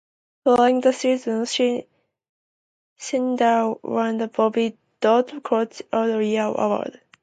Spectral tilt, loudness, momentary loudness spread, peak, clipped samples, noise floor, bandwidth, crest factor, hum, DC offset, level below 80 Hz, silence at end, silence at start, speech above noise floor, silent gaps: -4.5 dB/octave; -22 LUFS; 8 LU; -6 dBFS; under 0.1%; under -90 dBFS; 9.4 kHz; 16 dB; none; under 0.1%; -68 dBFS; 0.3 s; 0.45 s; over 69 dB; 2.29-2.96 s